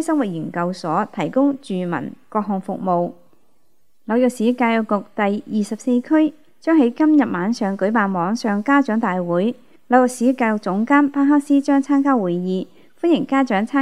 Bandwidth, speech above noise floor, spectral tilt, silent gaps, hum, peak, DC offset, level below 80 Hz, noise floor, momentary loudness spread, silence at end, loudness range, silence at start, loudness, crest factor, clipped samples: 12.5 kHz; 49 dB; -6.5 dB/octave; none; none; 0 dBFS; 0.4%; -72 dBFS; -67 dBFS; 9 LU; 0 s; 5 LU; 0 s; -19 LUFS; 18 dB; under 0.1%